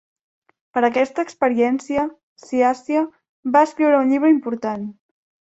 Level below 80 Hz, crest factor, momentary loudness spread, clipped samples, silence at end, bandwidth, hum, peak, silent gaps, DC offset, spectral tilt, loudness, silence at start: -62 dBFS; 18 dB; 12 LU; under 0.1%; 0.5 s; 8 kHz; none; -2 dBFS; 2.23-2.36 s, 3.29-3.43 s; under 0.1%; -5.5 dB/octave; -19 LUFS; 0.75 s